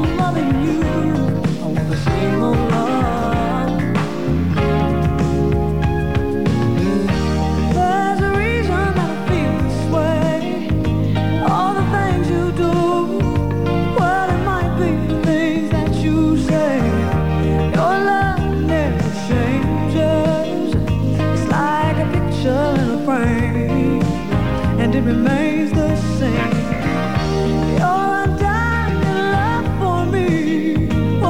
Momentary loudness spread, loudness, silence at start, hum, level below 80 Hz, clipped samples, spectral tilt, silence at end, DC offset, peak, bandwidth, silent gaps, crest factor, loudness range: 3 LU; -17 LUFS; 0 s; none; -28 dBFS; under 0.1%; -7.5 dB/octave; 0 s; 3%; -4 dBFS; 16 kHz; none; 12 dB; 1 LU